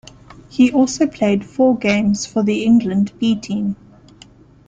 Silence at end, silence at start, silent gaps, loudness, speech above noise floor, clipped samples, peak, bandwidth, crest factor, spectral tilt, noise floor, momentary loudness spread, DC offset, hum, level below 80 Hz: 0.95 s; 0.55 s; none; -17 LUFS; 30 dB; under 0.1%; -2 dBFS; 9 kHz; 14 dB; -5.5 dB/octave; -45 dBFS; 8 LU; under 0.1%; 50 Hz at -50 dBFS; -50 dBFS